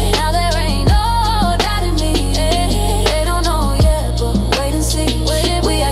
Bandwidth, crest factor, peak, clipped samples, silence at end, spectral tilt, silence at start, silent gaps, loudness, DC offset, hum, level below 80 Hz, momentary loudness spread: 15.5 kHz; 12 dB; -2 dBFS; under 0.1%; 0 s; -4.5 dB/octave; 0 s; none; -16 LUFS; under 0.1%; none; -18 dBFS; 2 LU